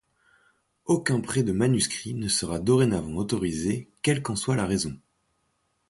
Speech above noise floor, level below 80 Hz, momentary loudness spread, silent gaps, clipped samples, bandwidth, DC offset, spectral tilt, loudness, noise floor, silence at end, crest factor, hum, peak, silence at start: 48 dB; -50 dBFS; 7 LU; none; under 0.1%; 11.5 kHz; under 0.1%; -5 dB/octave; -26 LUFS; -73 dBFS; 0.95 s; 18 dB; none; -8 dBFS; 0.85 s